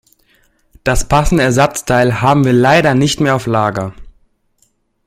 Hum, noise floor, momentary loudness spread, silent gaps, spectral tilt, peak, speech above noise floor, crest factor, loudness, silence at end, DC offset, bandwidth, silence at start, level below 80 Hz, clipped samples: none; -59 dBFS; 8 LU; none; -5.5 dB/octave; 0 dBFS; 48 dB; 14 dB; -12 LUFS; 1 s; under 0.1%; 16 kHz; 0.85 s; -28 dBFS; under 0.1%